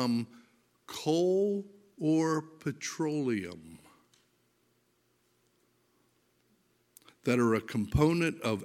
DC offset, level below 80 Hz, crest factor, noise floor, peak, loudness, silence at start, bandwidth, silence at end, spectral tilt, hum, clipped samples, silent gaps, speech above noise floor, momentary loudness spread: under 0.1%; -54 dBFS; 20 dB; -73 dBFS; -12 dBFS; -31 LUFS; 0 s; 16 kHz; 0 s; -6 dB/octave; 60 Hz at -70 dBFS; under 0.1%; none; 43 dB; 14 LU